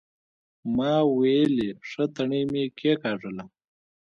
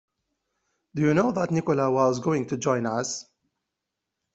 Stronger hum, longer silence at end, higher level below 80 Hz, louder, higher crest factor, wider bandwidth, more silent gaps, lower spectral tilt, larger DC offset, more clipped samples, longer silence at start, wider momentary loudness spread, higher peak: neither; second, 0.6 s vs 1.1 s; about the same, -64 dBFS vs -62 dBFS; about the same, -25 LUFS vs -25 LUFS; about the same, 16 dB vs 18 dB; second, 7 kHz vs 8.2 kHz; neither; first, -7.5 dB/octave vs -6 dB/octave; neither; neither; second, 0.65 s vs 0.95 s; first, 12 LU vs 9 LU; about the same, -10 dBFS vs -8 dBFS